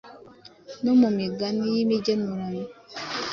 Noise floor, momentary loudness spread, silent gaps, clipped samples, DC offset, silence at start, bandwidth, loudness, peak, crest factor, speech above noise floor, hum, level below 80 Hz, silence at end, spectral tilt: -49 dBFS; 16 LU; none; under 0.1%; under 0.1%; 0.05 s; 7 kHz; -25 LUFS; -10 dBFS; 16 dB; 26 dB; none; -64 dBFS; 0 s; -6 dB/octave